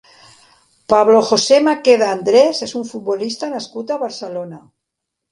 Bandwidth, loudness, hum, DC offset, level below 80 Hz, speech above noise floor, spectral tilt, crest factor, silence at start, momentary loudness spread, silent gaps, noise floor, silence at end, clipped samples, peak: 11.5 kHz; -15 LUFS; none; under 0.1%; -62 dBFS; 64 dB; -3.5 dB/octave; 16 dB; 0.9 s; 14 LU; none; -79 dBFS; 0.75 s; under 0.1%; 0 dBFS